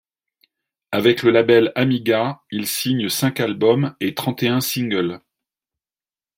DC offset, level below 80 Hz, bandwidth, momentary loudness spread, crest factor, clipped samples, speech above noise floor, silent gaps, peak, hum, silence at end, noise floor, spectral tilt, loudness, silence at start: under 0.1%; -62 dBFS; 16.5 kHz; 9 LU; 18 dB; under 0.1%; over 72 dB; none; -2 dBFS; none; 1.2 s; under -90 dBFS; -5 dB/octave; -19 LUFS; 0.9 s